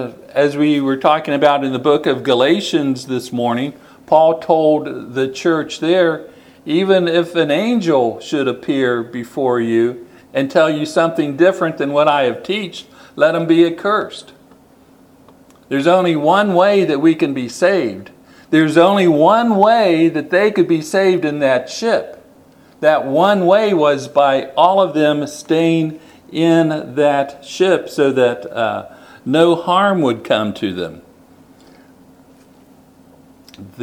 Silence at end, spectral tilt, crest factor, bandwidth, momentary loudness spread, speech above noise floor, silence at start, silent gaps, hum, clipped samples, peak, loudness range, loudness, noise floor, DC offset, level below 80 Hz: 0 s; -6 dB/octave; 16 dB; 14.5 kHz; 10 LU; 33 dB; 0 s; none; none; under 0.1%; 0 dBFS; 4 LU; -15 LUFS; -47 dBFS; under 0.1%; -62 dBFS